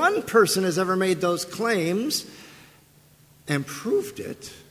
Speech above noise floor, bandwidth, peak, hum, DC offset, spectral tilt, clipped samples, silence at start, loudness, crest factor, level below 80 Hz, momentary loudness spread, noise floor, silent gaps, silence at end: 31 dB; 16 kHz; -6 dBFS; none; under 0.1%; -4 dB/octave; under 0.1%; 0 s; -24 LUFS; 20 dB; -64 dBFS; 18 LU; -55 dBFS; none; 0.1 s